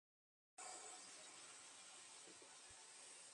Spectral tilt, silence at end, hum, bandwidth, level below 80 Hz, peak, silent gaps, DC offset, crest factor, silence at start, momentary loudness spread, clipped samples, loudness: 0.5 dB/octave; 0 s; none; 11.5 kHz; under -90 dBFS; -44 dBFS; none; under 0.1%; 16 dB; 0.55 s; 5 LU; under 0.1%; -58 LUFS